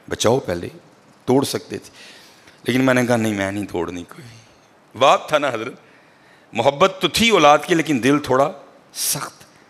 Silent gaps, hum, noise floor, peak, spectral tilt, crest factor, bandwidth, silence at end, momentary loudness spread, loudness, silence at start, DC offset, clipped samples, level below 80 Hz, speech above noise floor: none; none; -51 dBFS; 0 dBFS; -4 dB/octave; 20 dB; 15.5 kHz; 0.4 s; 18 LU; -18 LUFS; 0.1 s; under 0.1%; under 0.1%; -54 dBFS; 33 dB